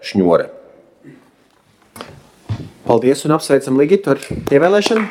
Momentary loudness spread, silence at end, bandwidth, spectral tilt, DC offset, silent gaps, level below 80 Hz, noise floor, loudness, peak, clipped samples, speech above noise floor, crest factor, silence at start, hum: 20 LU; 0 s; 15.5 kHz; -5.5 dB/octave; under 0.1%; none; -48 dBFS; -54 dBFS; -15 LUFS; 0 dBFS; under 0.1%; 40 dB; 16 dB; 0 s; none